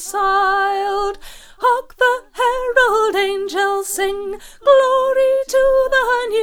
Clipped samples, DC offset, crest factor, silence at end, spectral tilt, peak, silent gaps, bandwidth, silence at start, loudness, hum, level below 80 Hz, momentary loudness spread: under 0.1%; under 0.1%; 16 dB; 0 s; -1 dB/octave; 0 dBFS; none; 17.5 kHz; 0 s; -16 LUFS; none; -42 dBFS; 7 LU